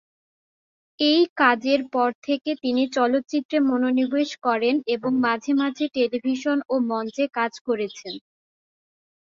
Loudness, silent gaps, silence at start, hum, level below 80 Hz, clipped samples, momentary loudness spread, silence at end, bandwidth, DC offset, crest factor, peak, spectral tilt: -23 LUFS; 1.29-1.36 s, 2.15-2.22 s, 3.45-3.49 s, 7.61-7.65 s; 1 s; none; -72 dBFS; under 0.1%; 7 LU; 1.1 s; 7.4 kHz; under 0.1%; 20 dB; -2 dBFS; -4 dB/octave